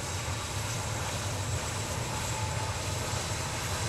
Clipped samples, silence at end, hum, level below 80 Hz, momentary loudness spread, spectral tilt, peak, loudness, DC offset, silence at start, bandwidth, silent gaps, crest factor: under 0.1%; 0 s; none; -46 dBFS; 1 LU; -3.5 dB/octave; -20 dBFS; -33 LUFS; under 0.1%; 0 s; 16 kHz; none; 14 dB